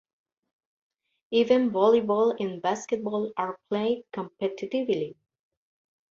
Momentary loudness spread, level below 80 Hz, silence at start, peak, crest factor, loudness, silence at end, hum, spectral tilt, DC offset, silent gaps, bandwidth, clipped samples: 10 LU; -72 dBFS; 1.3 s; -8 dBFS; 20 dB; -26 LUFS; 1 s; none; -5.5 dB/octave; under 0.1%; none; 7.6 kHz; under 0.1%